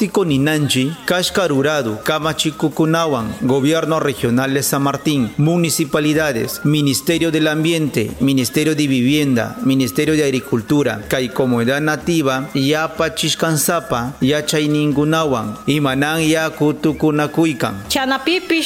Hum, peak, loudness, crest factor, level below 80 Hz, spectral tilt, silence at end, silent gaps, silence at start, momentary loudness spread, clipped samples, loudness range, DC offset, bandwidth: none; -2 dBFS; -17 LUFS; 14 dB; -46 dBFS; -4.5 dB/octave; 0 s; none; 0 s; 3 LU; under 0.1%; 1 LU; under 0.1%; 17 kHz